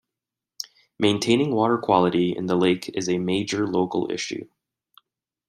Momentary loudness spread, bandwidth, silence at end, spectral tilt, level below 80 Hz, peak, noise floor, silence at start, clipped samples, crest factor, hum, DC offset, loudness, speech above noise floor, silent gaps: 16 LU; 15.5 kHz; 1.05 s; -5 dB/octave; -64 dBFS; -4 dBFS; -87 dBFS; 0.6 s; under 0.1%; 20 dB; none; under 0.1%; -23 LUFS; 65 dB; none